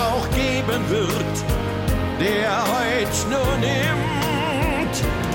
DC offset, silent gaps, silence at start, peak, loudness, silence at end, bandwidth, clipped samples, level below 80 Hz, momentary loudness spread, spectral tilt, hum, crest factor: under 0.1%; none; 0 s; -8 dBFS; -21 LUFS; 0 s; 17 kHz; under 0.1%; -32 dBFS; 3 LU; -5 dB/octave; none; 12 dB